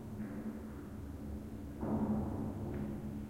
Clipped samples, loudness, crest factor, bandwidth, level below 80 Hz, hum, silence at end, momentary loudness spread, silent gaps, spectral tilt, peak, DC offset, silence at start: under 0.1%; -41 LUFS; 16 dB; 16.5 kHz; -52 dBFS; none; 0 s; 11 LU; none; -9 dB/octave; -24 dBFS; under 0.1%; 0 s